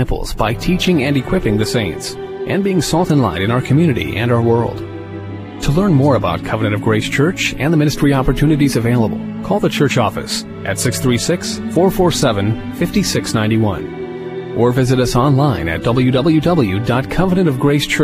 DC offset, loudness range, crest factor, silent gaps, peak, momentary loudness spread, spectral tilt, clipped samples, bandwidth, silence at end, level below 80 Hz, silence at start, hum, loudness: under 0.1%; 2 LU; 14 dB; none; 0 dBFS; 9 LU; -6 dB/octave; under 0.1%; 15.5 kHz; 0 s; -32 dBFS; 0 s; none; -15 LUFS